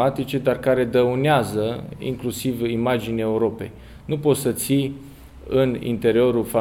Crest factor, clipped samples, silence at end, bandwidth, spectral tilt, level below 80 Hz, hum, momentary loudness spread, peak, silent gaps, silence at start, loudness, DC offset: 16 dB; under 0.1%; 0 s; 17 kHz; -6 dB/octave; -48 dBFS; none; 11 LU; -4 dBFS; none; 0 s; -22 LUFS; under 0.1%